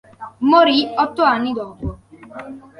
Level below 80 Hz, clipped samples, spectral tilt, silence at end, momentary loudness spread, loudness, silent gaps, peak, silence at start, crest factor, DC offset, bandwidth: -42 dBFS; under 0.1%; -6.5 dB/octave; 0.2 s; 23 LU; -16 LUFS; none; -2 dBFS; 0.2 s; 18 dB; under 0.1%; 11 kHz